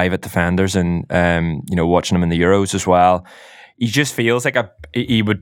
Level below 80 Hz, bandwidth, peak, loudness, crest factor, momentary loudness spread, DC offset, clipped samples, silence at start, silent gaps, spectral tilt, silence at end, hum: -40 dBFS; 17 kHz; 0 dBFS; -17 LUFS; 16 dB; 7 LU; under 0.1%; under 0.1%; 0 s; none; -5.5 dB/octave; 0 s; none